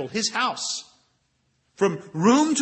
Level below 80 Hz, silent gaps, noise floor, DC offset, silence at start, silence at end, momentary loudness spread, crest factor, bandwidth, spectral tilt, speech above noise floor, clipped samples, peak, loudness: -72 dBFS; none; -70 dBFS; under 0.1%; 0 s; 0 s; 10 LU; 18 dB; 8.8 kHz; -3.5 dB/octave; 47 dB; under 0.1%; -6 dBFS; -23 LUFS